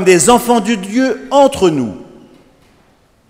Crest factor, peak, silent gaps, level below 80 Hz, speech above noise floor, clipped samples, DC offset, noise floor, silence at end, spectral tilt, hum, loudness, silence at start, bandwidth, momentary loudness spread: 14 dB; 0 dBFS; none; -44 dBFS; 40 dB; 0.2%; under 0.1%; -51 dBFS; 1.25 s; -4 dB/octave; none; -12 LUFS; 0 s; 16.5 kHz; 11 LU